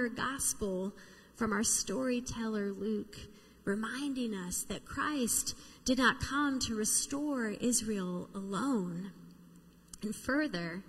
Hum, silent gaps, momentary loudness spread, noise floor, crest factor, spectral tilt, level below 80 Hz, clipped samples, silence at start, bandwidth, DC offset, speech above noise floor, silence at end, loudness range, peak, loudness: none; none; 11 LU; -58 dBFS; 22 dB; -3 dB/octave; -58 dBFS; under 0.1%; 0 s; 15.5 kHz; under 0.1%; 24 dB; 0 s; 5 LU; -14 dBFS; -34 LUFS